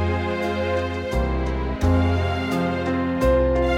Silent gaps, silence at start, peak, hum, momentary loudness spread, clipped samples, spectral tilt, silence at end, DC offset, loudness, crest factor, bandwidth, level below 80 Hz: none; 0 s; -8 dBFS; none; 5 LU; under 0.1%; -7.5 dB/octave; 0 s; under 0.1%; -22 LUFS; 14 dB; 15 kHz; -28 dBFS